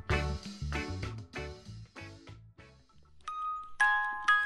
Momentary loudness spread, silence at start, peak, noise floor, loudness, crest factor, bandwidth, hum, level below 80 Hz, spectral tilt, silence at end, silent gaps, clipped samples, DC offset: 21 LU; 0.05 s; -14 dBFS; -59 dBFS; -33 LUFS; 20 dB; 12 kHz; none; -46 dBFS; -4.5 dB/octave; 0 s; none; under 0.1%; under 0.1%